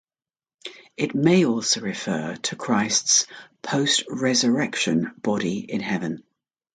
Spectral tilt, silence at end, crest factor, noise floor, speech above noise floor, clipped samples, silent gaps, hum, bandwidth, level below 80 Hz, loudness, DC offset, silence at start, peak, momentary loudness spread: -3 dB/octave; 0.55 s; 18 dB; under -90 dBFS; over 67 dB; under 0.1%; none; none; 9.6 kHz; -66 dBFS; -22 LUFS; under 0.1%; 0.65 s; -6 dBFS; 15 LU